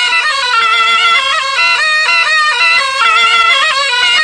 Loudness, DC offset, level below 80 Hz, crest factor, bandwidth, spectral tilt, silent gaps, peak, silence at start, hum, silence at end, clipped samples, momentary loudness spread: -8 LUFS; under 0.1%; -52 dBFS; 10 dB; 10.5 kHz; 2 dB/octave; none; 0 dBFS; 0 s; none; 0 s; under 0.1%; 3 LU